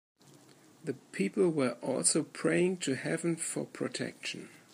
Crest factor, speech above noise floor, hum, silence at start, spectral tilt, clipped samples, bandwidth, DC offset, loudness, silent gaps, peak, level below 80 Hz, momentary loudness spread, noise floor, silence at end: 22 dB; 27 dB; none; 0.85 s; -4 dB/octave; under 0.1%; 15.5 kHz; under 0.1%; -32 LUFS; none; -12 dBFS; -80 dBFS; 12 LU; -59 dBFS; 0.15 s